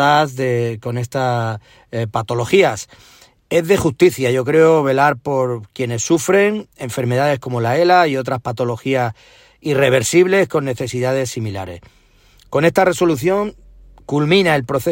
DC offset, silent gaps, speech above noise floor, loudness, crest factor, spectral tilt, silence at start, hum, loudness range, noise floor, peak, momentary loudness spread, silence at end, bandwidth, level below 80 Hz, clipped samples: under 0.1%; none; 34 dB; -17 LUFS; 16 dB; -5.5 dB/octave; 0 s; none; 4 LU; -50 dBFS; 0 dBFS; 12 LU; 0 s; 16.5 kHz; -50 dBFS; under 0.1%